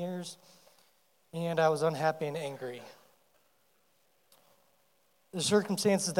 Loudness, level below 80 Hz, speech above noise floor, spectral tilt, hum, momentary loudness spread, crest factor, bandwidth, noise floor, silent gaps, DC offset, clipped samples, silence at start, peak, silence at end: -31 LUFS; -84 dBFS; 41 dB; -4.5 dB/octave; none; 17 LU; 20 dB; 17 kHz; -72 dBFS; none; under 0.1%; under 0.1%; 0 s; -14 dBFS; 0 s